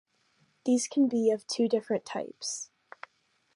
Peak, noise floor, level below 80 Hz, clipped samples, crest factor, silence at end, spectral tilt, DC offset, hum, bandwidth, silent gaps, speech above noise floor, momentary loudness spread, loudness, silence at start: -14 dBFS; -71 dBFS; -84 dBFS; under 0.1%; 16 dB; 0.9 s; -4 dB/octave; under 0.1%; none; 11.5 kHz; none; 43 dB; 23 LU; -29 LUFS; 0.65 s